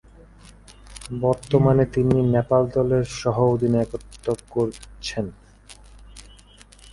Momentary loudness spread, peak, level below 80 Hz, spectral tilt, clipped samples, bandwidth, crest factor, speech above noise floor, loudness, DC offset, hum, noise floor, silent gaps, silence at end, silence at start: 13 LU; -4 dBFS; -44 dBFS; -7.5 dB/octave; under 0.1%; 11.5 kHz; 18 dB; 28 dB; -22 LUFS; under 0.1%; none; -49 dBFS; none; 0.7 s; 0.85 s